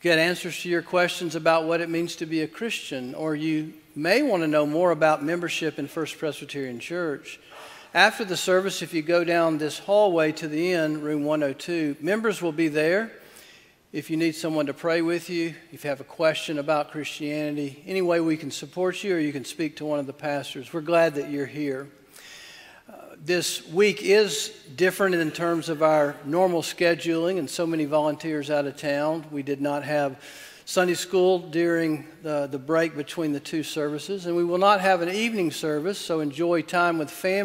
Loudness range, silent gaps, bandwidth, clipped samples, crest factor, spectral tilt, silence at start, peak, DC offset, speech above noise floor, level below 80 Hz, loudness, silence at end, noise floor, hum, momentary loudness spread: 4 LU; none; 16 kHz; under 0.1%; 22 dB; -4.5 dB/octave; 0.05 s; -2 dBFS; under 0.1%; 29 dB; -70 dBFS; -25 LUFS; 0 s; -53 dBFS; none; 10 LU